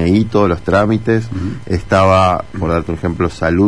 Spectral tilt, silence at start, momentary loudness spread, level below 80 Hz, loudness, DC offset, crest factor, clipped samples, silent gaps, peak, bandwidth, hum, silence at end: -7.5 dB/octave; 0 s; 9 LU; -32 dBFS; -15 LUFS; 2%; 14 dB; under 0.1%; none; 0 dBFS; 10.5 kHz; none; 0 s